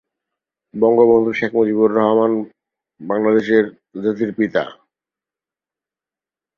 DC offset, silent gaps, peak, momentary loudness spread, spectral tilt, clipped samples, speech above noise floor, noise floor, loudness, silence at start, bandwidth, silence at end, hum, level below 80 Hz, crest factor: under 0.1%; none; -2 dBFS; 12 LU; -8 dB/octave; under 0.1%; 74 dB; -90 dBFS; -17 LUFS; 0.75 s; 6.4 kHz; 1.85 s; none; -62 dBFS; 16 dB